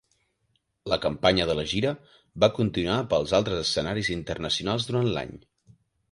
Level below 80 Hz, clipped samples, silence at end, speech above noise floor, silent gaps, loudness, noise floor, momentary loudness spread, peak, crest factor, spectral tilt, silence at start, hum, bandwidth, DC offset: -48 dBFS; under 0.1%; 0.75 s; 47 dB; none; -26 LUFS; -73 dBFS; 9 LU; -4 dBFS; 22 dB; -5 dB/octave; 0.85 s; none; 11.5 kHz; under 0.1%